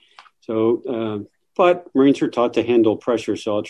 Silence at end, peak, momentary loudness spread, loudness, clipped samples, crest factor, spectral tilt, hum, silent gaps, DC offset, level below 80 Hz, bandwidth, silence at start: 0 s; -4 dBFS; 10 LU; -19 LUFS; under 0.1%; 16 dB; -6.5 dB/octave; none; none; under 0.1%; -60 dBFS; 10.5 kHz; 0.5 s